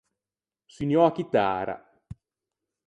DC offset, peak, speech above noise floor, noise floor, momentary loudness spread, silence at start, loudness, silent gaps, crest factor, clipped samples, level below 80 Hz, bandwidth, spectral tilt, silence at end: under 0.1%; -8 dBFS; over 66 dB; under -90 dBFS; 13 LU; 0.8 s; -25 LUFS; none; 20 dB; under 0.1%; -60 dBFS; 9 kHz; -7.5 dB/octave; 0.75 s